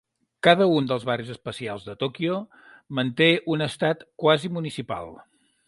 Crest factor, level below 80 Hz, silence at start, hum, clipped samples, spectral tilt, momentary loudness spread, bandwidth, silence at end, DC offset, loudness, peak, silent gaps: 22 dB; -62 dBFS; 0.45 s; none; under 0.1%; -6 dB/octave; 14 LU; 11.5 kHz; 0.55 s; under 0.1%; -24 LUFS; -4 dBFS; none